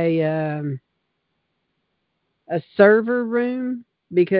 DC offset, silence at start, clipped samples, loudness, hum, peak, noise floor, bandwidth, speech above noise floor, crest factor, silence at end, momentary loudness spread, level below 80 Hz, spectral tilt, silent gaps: under 0.1%; 0 s; under 0.1%; -20 LUFS; none; -2 dBFS; -74 dBFS; 5 kHz; 55 dB; 20 dB; 0 s; 15 LU; -68 dBFS; -12 dB/octave; none